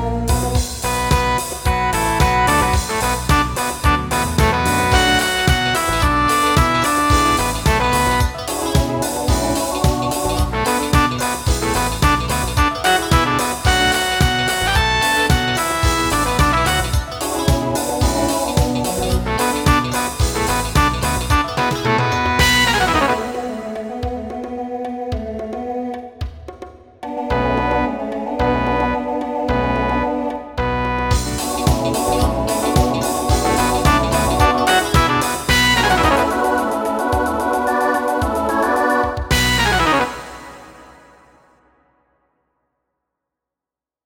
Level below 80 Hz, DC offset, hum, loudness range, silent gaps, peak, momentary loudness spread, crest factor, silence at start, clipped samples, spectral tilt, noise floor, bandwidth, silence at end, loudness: -26 dBFS; under 0.1%; none; 6 LU; none; 0 dBFS; 10 LU; 18 dB; 0 s; under 0.1%; -4 dB/octave; -88 dBFS; 18.5 kHz; 3.15 s; -17 LUFS